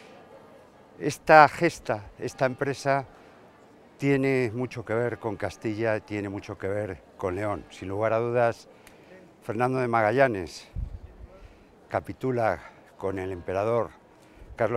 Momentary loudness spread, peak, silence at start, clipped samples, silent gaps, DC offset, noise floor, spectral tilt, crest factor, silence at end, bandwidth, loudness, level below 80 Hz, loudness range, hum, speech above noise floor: 14 LU; 0 dBFS; 0 s; under 0.1%; none; under 0.1%; -54 dBFS; -6.5 dB/octave; 28 dB; 0 s; 15.5 kHz; -26 LUFS; -52 dBFS; 7 LU; none; 28 dB